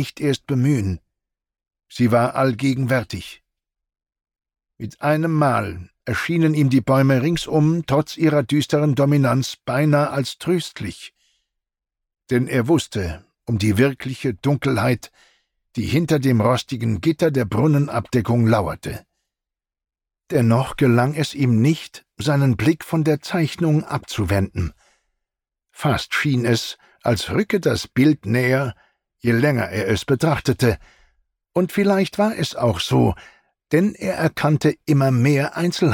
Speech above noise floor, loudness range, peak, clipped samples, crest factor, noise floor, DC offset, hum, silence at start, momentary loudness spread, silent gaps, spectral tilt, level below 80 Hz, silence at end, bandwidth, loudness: 68 dB; 4 LU; -4 dBFS; under 0.1%; 14 dB; -87 dBFS; under 0.1%; none; 0 s; 9 LU; none; -6.5 dB/octave; -46 dBFS; 0 s; 17 kHz; -20 LUFS